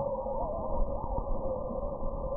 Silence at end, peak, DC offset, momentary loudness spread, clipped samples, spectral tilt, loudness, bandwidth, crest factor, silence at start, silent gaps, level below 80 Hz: 0 s; -18 dBFS; under 0.1%; 2 LU; under 0.1%; -15 dB/octave; -35 LUFS; 1.3 kHz; 14 dB; 0 s; none; -36 dBFS